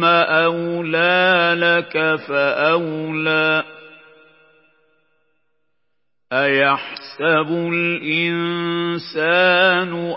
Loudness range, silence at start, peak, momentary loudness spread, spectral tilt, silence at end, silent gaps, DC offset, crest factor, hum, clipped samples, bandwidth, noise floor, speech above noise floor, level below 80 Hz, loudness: 7 LU; 0 s; -2 dBFS; 9 LU; -9.5 dB/octave; 0 s; none; under 0.1%; 18 dB; none; under 0.1%; 5.8 kHz; -78 dBFS; 60 dB; -76 dBFS; -17 LUFS